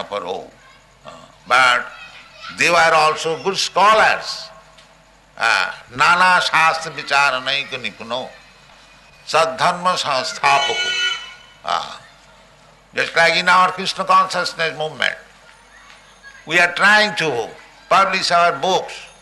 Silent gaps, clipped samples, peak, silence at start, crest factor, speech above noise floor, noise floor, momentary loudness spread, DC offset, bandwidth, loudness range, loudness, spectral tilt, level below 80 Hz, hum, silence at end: none; under 0.1%; -2 dBFS; 0 s; 16 dB; 33 dB; -50 dBFS; 17 LU; under 0.1%; 12 kHz; 4 LU; -16 LUFS; -2 dB/octave; -58 dBFS; none; 0.15 s